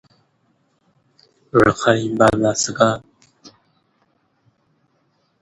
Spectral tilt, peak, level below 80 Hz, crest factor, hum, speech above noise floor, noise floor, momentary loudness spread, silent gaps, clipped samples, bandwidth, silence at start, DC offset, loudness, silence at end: -4.5 dB/octave; 0 dBFS; -48 dBFS; 22 dB; none; 49 dB; -65 dBFS; 4 LU; none; under 0.1%; 11.5 kHz; 1.55 s; under 0.1%; -17 LUFS; 1.95 s